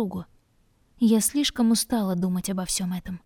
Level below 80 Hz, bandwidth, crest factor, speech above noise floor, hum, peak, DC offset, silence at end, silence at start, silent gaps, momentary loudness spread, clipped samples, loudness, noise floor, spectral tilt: -50 dBFS; 19 kHz; 16 dB; 39 dB; none; -10 dBFS; under 0.1%; 0.1 s; 0 s; none; 9 LU; under 0.1%; -24 LUFS; -64 dBFS; -4.5 dB/octave